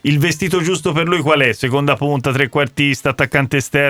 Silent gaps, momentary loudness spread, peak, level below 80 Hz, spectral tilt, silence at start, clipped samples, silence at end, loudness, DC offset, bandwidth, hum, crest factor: none; 3 LU; 0 dBFS; -46 dBFS; -5 dB/octave; 0.05 s; under 0.1%; 0 s; -15 LUFS; under 0.1%; 16 kHz; none; 16 dB